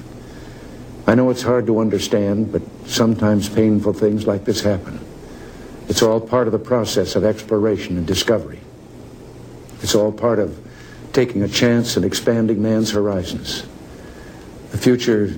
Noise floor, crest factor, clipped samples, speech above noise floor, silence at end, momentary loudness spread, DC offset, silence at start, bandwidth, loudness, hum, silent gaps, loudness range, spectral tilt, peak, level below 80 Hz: -38 dBFS; 18 dB; under 0.1%; 21 dB; 0 s; 22 LU; under 0.1%; 0 s; 17.5 kHz; -18 LUFS; none; none; 3 LU; -5.5 dB/octave; 0 dBFS; -44 dBFS